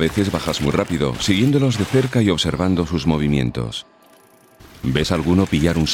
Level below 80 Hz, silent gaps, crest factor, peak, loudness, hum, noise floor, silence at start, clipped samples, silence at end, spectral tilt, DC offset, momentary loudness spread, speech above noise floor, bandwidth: -36 dBFS; none; 18 dB; 0 dBFS; -19 LUFS; none; -50 dBFS; 0 s; under 0.1%; 0 s; -5.5 dB/octave; under 0.1%; 6 LU; 32 dB; 17 kHz